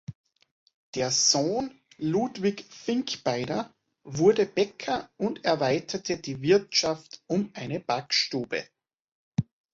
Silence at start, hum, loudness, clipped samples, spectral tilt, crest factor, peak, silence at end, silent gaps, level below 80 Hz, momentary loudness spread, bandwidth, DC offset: 0.1 s; none; -27 LUFS; under 0.1%; -3.5 dB/octave; 20 dB; -8 dBFS; 0.3 s; 0.15-0.24 s, 0.51-0.66 s, 0.74-0.93 s, 9.00-9.32 s; -64 dBFS; 12 LU; 8 kHz; under 0.1%